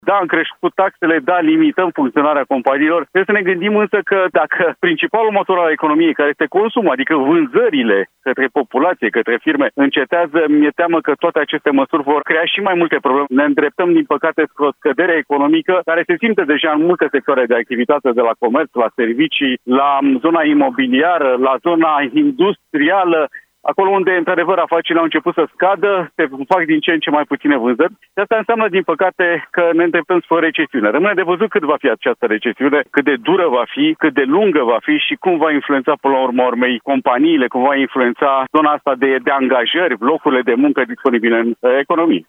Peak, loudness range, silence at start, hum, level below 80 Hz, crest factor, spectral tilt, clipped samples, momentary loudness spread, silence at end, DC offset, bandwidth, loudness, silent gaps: 0 dBFS; 1 LU; 0.05 s; none; -72 dBFS; 14 dB; -7.5 dB/octave; under 0.1%; 3 LU; 0.1 s; under 0.1%; 3.9 kHz; -14 LUFS; none